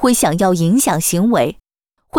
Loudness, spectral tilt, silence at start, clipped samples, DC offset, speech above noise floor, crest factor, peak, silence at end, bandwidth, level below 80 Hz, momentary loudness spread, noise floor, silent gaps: -15 LUFS; -5 dB/octave; 0 s; under 0.1%; under 0.1%; 57 dB; 12 dB; -4 dBFS; 0 s; over 20 kHz; -46 dBFS; 3 LU; -71 dBFS; none